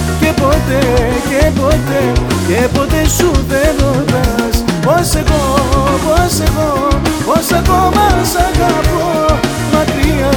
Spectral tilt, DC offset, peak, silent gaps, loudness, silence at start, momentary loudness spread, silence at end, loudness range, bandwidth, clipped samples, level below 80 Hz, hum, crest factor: -5 dB/octave; under 0.1%; 0 dBFS; none; -12 LUFS; 0 s; 2 LU; 0 s; 1 LU; over 20 kHz; under 0.1%; -18 dBFS; none; 10 dB